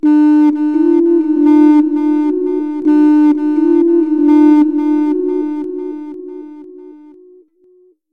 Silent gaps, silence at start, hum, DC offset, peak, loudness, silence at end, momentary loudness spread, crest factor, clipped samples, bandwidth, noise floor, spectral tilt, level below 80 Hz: none; 0.05 s; none; 0.6%; -2 dBFS; -11 LUFS; 1.15 s; 16 LU; 10 dB; under 0.1%; 4 kHz; -50 dBFS; -7 dB/octave; -68 dBFS